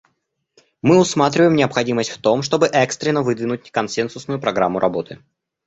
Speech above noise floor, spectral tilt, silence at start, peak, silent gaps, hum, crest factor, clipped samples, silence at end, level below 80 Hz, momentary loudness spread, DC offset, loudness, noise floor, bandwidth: 54 dB; -5 dB/octave; 0.85 s; 0 dBFS; none; none; 18 dB; under 0.1%; 0.5 s; -56 dBFS; 9 LU; under 0.1%; -18 LUFS; -71 dBFS; 8.2 kHz